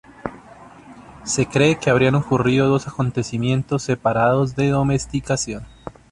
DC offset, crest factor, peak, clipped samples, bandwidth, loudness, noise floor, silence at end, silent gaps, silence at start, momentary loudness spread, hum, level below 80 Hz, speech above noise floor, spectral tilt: under 0.1%; 18 dB; -2 dBFS; under 0.1%; 11.5 kHz; -19 LUFS; -43 dBFS; 0.2 s; none; 0.25 s; 17 LU; none; -46 dBFS; 24 dB; -5.5 dB/octave